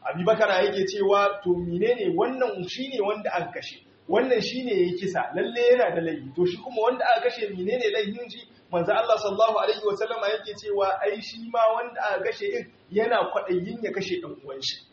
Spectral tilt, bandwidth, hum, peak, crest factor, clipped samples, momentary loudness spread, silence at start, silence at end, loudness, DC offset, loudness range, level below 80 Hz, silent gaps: -3 dB/octave; 7.2 kHz; none; -8 dBFS; 18 dB; under 0.1%; 9 LU; 0 s; 0.15 s; -25 LUFS; under 0.1%; 3 LU; -64 dBFS; none